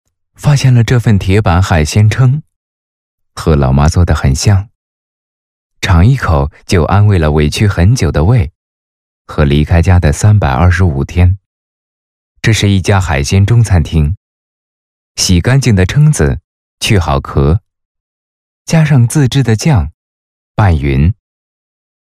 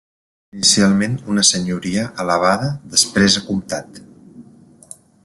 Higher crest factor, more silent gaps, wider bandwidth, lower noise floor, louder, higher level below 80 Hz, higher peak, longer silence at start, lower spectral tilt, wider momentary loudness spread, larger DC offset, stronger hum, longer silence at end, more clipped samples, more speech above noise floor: second, 10 dB vs 18 dB; first, 2.56-3.18 s, 4.75-5.70 s, 8.55-9.25 s, 11.46-12.35 s, 14.17-15.15 s, 16.44-16.78 s, 17.85-18.65 s, 19.94-20.55 s vs none; first, 14 kHz vs 12.5 kHz; first, under -90 dBFS vs -46 dBFS; first, -10 LUFS vs -16 LUFS; first, -22 dBFS vs -52 dBFS; about the same, 0 dBFS vs 0 dBFS; second, 0.4 s vs 0.55 s; first, -6 dB/octave vs -3 dB/octave; about the same, 8 LU vs 10 LU; neither; neither; first, 1.05 s vs 0.85 s; neither; first, over 81 dB vs 28 dB